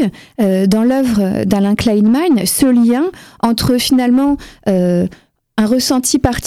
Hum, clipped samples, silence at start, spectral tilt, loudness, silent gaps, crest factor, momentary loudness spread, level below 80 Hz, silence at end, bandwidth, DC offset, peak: none; under 0.1%; 0 s; -5 dB/octave; -13 LUFS; none; 14 dB; 6 LU; -38 dBFS; 0 s; 16 kHz; 0.1%; 0 dBFS